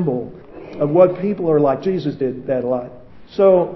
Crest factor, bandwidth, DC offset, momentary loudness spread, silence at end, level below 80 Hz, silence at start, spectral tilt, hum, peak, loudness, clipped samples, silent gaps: 18 dB; 6 kHz; under 0.1%; 19 LU; 0 s; -54 dBFS; 0 s; -10 dB/octave; none; 0 dBFS; -18 LUFS; under 0.1%; none